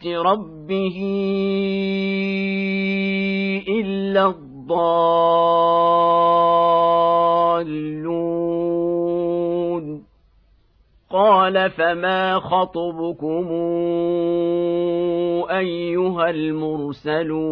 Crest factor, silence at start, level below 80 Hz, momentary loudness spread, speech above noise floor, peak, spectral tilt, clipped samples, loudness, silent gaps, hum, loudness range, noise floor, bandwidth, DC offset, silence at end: 14 dB; 0 s; -56 dBFS; 9 LU; 38 dB; -4 dBFS; -9 dB/octave; under 0.1%; -19 LUFS; none; none; 5 LU; -57 dBFS; 5.4 kHz; under 0.1%; 0 s